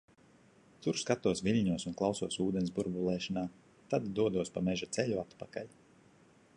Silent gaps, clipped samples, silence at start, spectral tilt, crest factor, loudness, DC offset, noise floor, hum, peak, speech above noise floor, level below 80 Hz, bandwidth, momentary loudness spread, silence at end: none; under 0.1%; 0.8 s; -5.5 dB/octave; 20 dB; -35 LUFS; under 0.1%; -63 dBFS; none; -16 dBFS; 30 dB; -62 dBFS; 11 kHz; 12 LU; 0.9 s